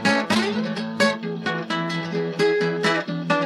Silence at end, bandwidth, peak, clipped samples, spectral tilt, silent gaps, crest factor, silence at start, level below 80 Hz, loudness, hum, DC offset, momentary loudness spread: 0 s; 13.5 kHz; -6 dBFS; under 0.1%; -5 dB/octave; none; 18 dB; 0 s; -72 dBFS; -23 LUFS; none; under 0.1%; 6 LU